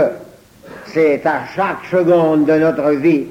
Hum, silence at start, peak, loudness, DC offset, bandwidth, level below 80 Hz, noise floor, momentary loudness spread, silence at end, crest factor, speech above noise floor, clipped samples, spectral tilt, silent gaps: none; 0 s; -2 dBFS; -15 LUFS; under 0.1%; 13 kHz; -54 dBFS; -40 dBFS; 9 LU; 0 s; 12 dB; 26 dB; under 0.1%; -8 dB/octave; none